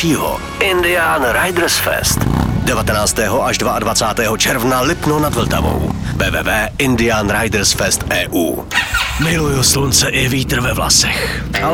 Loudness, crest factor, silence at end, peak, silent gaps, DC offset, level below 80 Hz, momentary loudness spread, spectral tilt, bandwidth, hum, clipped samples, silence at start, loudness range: -14 LUFS; 14 dB; 0 s; 0 dBFS; none; under 0.1%; -28 dBFS; 5 LU; -3.5 dB/octave; 19 kHz; none; under 0.1%; 0 s; 2 LU